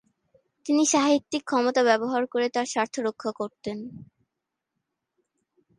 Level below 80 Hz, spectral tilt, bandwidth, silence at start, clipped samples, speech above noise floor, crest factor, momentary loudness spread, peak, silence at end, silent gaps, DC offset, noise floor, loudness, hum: -72 dBFS; -3 dB/octave; 11.5 kHz; 0.65 s; under 0.1%; 60 dB; 20 dB; 14 LU; -8 dBFS; 1.75 s; none; under 0.1%; -84 dBFS; -25 LUFS; none